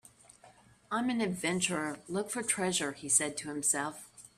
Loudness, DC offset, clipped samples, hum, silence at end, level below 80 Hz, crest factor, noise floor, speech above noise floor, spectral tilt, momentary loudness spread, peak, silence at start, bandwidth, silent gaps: -32 LUFS; under 0.1%; under 0.1%; none; 0.1 s; -70 dBFS; 22 dB; -60 dBFS; 27 dB; -2.5 dB/octave; 9 LU; -12 dBFS; 0.45 s; 15.5 kHz; none